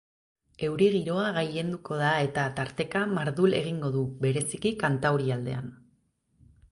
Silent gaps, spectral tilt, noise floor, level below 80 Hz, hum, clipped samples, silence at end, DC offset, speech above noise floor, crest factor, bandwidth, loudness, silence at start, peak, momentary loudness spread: none; -5.5 dB/octave; -70 dBFS; -60 dBFS; none; under 0.1%; 0.95 s; under 0.1%; 42 dB; 18 dB; 11.5 kHz; -28 LUFS; 0.6 s; -12 dBFS; 8 LU